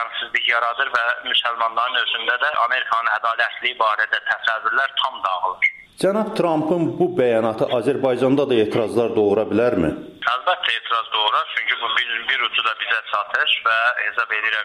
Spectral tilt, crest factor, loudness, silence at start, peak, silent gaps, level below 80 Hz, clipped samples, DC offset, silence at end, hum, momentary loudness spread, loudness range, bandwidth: -5 dB/octave; 14 dB; -19 LUFS; 0 s; -6 dBFS; none; -58 dBFS; under 0.1%; under 0.1%; 0 s; none; 3 LU; 1 LU; 13 kHz